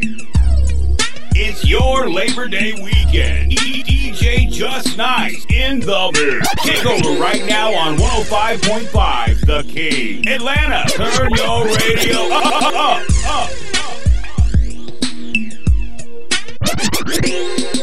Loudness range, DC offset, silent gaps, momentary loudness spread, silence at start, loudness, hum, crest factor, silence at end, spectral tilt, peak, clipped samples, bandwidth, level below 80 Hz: 4 LU; 20%; none; 5 LU; 0 s; -16 LUFS; none; 16 dB; 0 s; -4 dB/octave; 0 dBFS; under 0.1%; 16 kHz; -20 dBFS